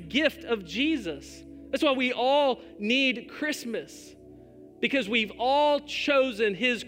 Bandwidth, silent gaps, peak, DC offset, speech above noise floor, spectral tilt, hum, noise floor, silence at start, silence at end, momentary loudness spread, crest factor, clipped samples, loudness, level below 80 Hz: 16 kHz; none; -10 dBFS; under 0.1%; 23 dB; -3.5 dB/octave; none; -50 dBFS; 0 s; 0 s; 13 LU; 18 dB; under 0.1%; -26 LUFS; -60 dBFS